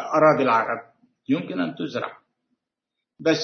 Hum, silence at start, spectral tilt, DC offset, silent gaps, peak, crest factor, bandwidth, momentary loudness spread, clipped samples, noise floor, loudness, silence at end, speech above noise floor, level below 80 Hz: none; 0 s; -5.5 dB/octave; under 0.1%; none; -4 dBFS; 20 dB; 6.6 kHz; 15 LU; under 0.1%; -84 dBFS; -23 LUFS; 0 s; 62 dB; -72 dBFS